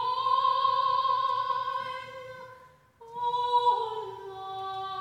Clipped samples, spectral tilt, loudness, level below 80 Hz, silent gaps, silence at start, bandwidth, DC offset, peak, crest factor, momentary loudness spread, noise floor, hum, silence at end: under 0.1%; -3.5 dB/octave; -28 LUFS; -72 dBFS; none; 0 s; 10.5 kHz; under 0.1%; -14 dBFS; 16 dB; 18 LU; -54 dBFS; none; 0 s